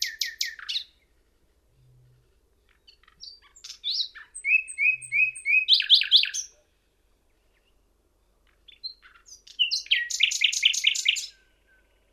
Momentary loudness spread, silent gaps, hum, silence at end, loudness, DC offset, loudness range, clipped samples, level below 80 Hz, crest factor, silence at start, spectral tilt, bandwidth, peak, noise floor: 25 LU; none; none; 0.85 s; -22 LUFS; under 0.1%; 15 LU; under 0.1%; -68 dBFS; 24 dB; 0 s; 5 dB/octave; 16 kHz; -6 dBFS; -67 dBFS